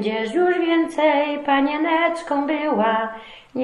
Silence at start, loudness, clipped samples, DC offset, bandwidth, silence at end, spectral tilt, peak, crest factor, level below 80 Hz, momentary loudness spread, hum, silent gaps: 0 s; -20 LUFS; under 0.1%; under 0.1%; 11.5 kHz; 0 s; -5.5 dB/octave; -4 dBFS; 16 dB; -60 dBFS; 6 LU; none; none